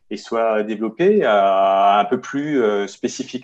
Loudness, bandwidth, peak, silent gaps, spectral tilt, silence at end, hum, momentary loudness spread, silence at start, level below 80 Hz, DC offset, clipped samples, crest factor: -18 LUFS; 8.2 kHz; -4 dBFS; none; -5 dB/octave; 0 s; none; 11 LU; 0.1 s; -70 dBFS; under 0.1%; under 0.1%; 14 dB